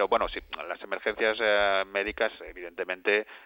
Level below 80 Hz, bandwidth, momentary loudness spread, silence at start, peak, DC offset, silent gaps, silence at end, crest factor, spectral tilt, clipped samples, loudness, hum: -54 dBFS; 16.5 kHz; 13 LU; 0 s; -10 dBFS; under 0.1%; none; 0.05 s; 20 dB; -5.5 dB/octave; under 0.1%; -28 LUFS; none